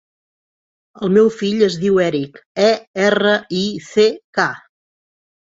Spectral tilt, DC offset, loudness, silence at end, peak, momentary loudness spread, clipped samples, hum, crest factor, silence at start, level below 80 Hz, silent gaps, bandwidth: -5 dB/octave; under 0.1%; -17 LUFS; 1 s; -2 dBFS; 8 LU; under 0.1%; none; 16 dB; 1 s; -60 dBFS; 2.46-2.55 s, 2.87-2.94 s, 4.24-4.33 s; 8 kHz